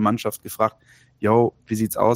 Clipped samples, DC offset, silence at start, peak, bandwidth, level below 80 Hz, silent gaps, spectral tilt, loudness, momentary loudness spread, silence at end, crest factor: under 0.1%; under 0.1%; 0 s; -4 dBFS; 16.5 kHz; -58 dBFS; none; -6.5 dB/octave; -22 LUFS; 8 LU; 0 s; 18 dB